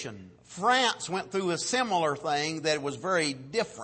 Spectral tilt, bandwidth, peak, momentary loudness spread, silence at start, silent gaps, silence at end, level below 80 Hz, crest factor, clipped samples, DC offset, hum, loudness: -3 dB/octave; 8.8 kHz; -12 dBFS; 8 LU; 0 s; none; 0 s; -70 dBFS; 18 dB; under 0.1%; under 0.1%; none; -28 LUFS